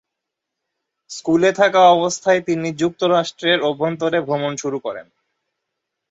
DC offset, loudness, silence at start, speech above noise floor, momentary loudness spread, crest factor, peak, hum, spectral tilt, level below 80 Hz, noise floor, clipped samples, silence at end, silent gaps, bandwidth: under 0.1%; -18 LUFS; 1.1 s; 64 dB; 14 LU; 18 dB; -2 dBFS; none; -4.5 dB/octave; -62 dBFS; -81 dBFS; under 0.1%; 1.1 s; none; 8 kHz